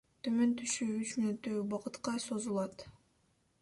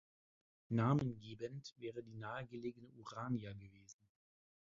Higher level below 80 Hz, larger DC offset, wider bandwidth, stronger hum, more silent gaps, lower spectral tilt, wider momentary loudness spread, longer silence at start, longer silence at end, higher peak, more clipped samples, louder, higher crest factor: about the same, -72 dBFS vs -72 dBFS; neither; first, 11.5 kHz vs 7.4 kHz; neither; second, none vs 1.72-1.76 s; second, -4.5 dB/octave vs -7 dB/octave; second, 8 LU vs 20 LU; second, 0.25 s vs 0.7 s; about the same, 0.7 s vs 0.75 s; about the same, -20 dBFS vs -22 dBFS; neither; first, -36 LUFS vs -43 LUFS; second, 16 dB vs 22 dB